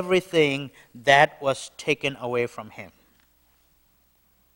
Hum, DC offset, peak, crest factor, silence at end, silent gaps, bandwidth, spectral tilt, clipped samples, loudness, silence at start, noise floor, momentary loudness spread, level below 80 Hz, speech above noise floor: 60 Hz at -60 dBFS; under 0.1%; -2 dBFS; 24 dB; 1.7 s; none; 16.5 kHz; -4.5 dB/octave; under 0.1%; -23 LUFS; 0 s; -64 dBFS; 22 LU; -62 dBFS; 40 dB